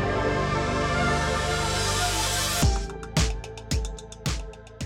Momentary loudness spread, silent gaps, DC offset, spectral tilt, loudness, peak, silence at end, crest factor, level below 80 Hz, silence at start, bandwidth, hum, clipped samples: 9 LU; none; under 0.1%; -3.5 dB/octave; -26 LUFS; -12 dBFS; 0 s; 14 dB; -32 dBFS; 0 s; 18 kHz; none; under 0.1%